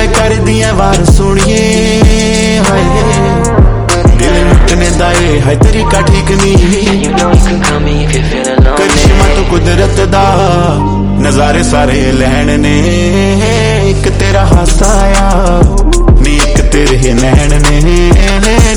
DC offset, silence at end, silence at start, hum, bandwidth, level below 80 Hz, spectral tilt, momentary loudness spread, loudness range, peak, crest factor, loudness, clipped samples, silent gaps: under 0.1%; 0 s; 0 s; none; 12 kHz; -10 dBFS; -5 dB/octave; 2 LU; 1 LU; 0 dBFS; 6 dB; -8 LUFS; 6%; none